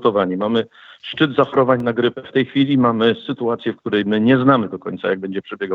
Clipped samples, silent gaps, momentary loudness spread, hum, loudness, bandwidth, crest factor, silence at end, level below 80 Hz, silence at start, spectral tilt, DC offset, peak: under 0.1%; none; 11 LU; none; -18 LUFS; 5 kHz; 16 dB; 0 s; -64 dBFS; 0 s; -8.5 dB/octave; under 0.1%; -2 dBFS